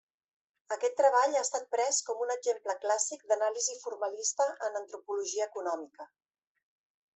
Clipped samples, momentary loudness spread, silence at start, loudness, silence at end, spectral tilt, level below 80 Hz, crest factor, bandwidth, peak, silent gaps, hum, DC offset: under 0.1%; 11 LU; 0.7 s; -31 LUFS; 1.1 s; 1 dB/octave; -88 dBFS; 20 dB; 8.4 kHz; -14 dBFS; none; none; under 0.1%